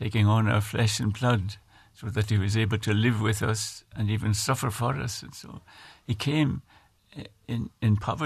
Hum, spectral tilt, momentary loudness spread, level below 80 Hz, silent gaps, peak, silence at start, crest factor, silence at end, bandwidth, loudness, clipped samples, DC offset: none; -5.5 dB/octave; 19 LU; -52 dBFS; none; -10 dBFS; 0 s; 16 dB; 0 s; 14 kHz; -27 LUFS; under 0.1%; under 0.1%